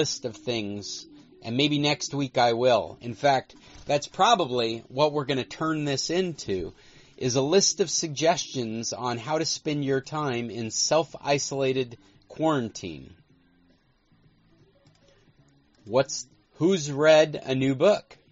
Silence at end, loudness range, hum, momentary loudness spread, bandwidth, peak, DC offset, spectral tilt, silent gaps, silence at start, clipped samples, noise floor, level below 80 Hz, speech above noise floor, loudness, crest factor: 0.15 s; 10 LU; none; 12 LU; 8 kHz; -6 dBFS; under 0.1%; -3.5 dB/octave; none; 0 s; under 0.1%; -63 dBFS; -60 dBFS; 38 dB; -25 LUFS; 20 dB